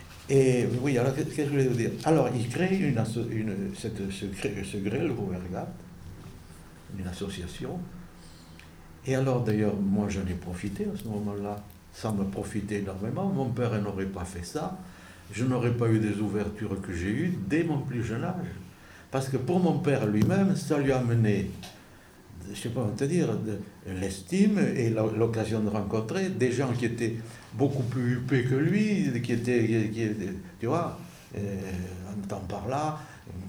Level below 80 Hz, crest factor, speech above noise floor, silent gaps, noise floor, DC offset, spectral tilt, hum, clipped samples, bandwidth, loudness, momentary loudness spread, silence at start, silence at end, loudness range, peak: -52 dBFS; 18 dB; 24 dB; none; -52 dBFS; under 0.1%; -7 dB/octave; none; under 0.1%; 17 kHz; -29 LUFS; 16 LU; 0 s; 0 s; 7 LU; -10 dBFS